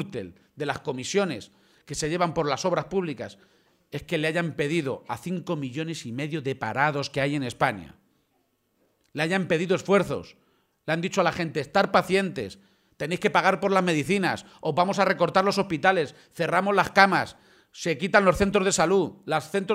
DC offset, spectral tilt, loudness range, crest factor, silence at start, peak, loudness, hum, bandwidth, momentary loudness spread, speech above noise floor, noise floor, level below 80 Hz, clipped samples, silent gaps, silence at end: under 0.1%; -5 dB/octave; 6 LU; 24 dB; 0 s; -2 dBFS; -25 LUFS; none; 16 kHz; 13 LU; 46 dB; -71 dBFS; -54 dBFS; under 0.1%; none; 0 s